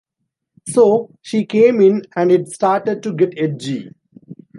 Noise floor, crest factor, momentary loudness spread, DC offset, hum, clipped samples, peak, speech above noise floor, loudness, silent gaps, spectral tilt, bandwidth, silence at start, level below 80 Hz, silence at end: -76 dBFS; 14 dB; 11 LU; under 0.1%; none; under 0.1%; -2 dBFS; 61 dB; -16 LUFS; none; -6.5 dB/octave; 11.5 kHz; 0.65 s; -68 dBFS; 0.25 s